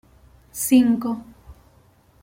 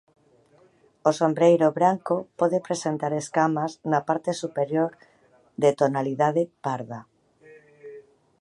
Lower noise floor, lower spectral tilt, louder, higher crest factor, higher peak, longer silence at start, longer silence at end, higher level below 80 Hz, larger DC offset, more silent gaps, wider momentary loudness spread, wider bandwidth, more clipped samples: about the same, -56 dBFS vs -59 dBFS; second, -4 dB/octave vs -6 dB/octave; first, -20 LUFS vs -24 LUFS; about the same, 18 dB vs 20 dB; about the same, -6 dBFS vs -6 dBFS; second, 0.55 s vs 1.05 s; first, 0.7 s vs 0.4 s; first, -52 dBFS vs -74 dBFS; neither; neither; first, 17 LU vs 13 LU; first, 16.5 kHz vs 11.5 kHz; neither